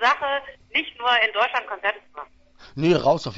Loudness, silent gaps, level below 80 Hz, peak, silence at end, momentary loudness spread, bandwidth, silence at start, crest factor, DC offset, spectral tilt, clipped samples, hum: -22 LUFS; none; -56 dBFS; -6 dBFS; 0 s; 18 LU; 7.8 kHz; 0 s; 18 dB; under 0.1%; -5 dB/octave; under 0.1%; none